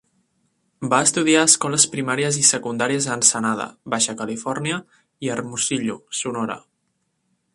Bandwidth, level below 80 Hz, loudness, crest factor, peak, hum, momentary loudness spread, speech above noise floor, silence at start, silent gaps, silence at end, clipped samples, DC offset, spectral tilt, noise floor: 11.5 kHz; -64 dBFS; -19 LUFS; 22 dB; 0 dBFS; none; 13 LU; 51 dB; 0.8 s; none; 0.95 s; under 0.1%; under 0.1%; -2.5 dB/octave; -72 dBFS